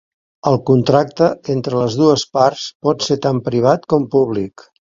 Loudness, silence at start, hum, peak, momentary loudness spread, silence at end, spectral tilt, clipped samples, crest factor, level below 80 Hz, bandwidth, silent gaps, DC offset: -16 LUFS; 0.45 s; none; 0 dBFS; 7 LU; 0.4 s; -6.5 dB/octave; under 0.1%; 16 dB; -54 dBFS; 7.6 kHz; 2.75-2.80 s; under 0.1%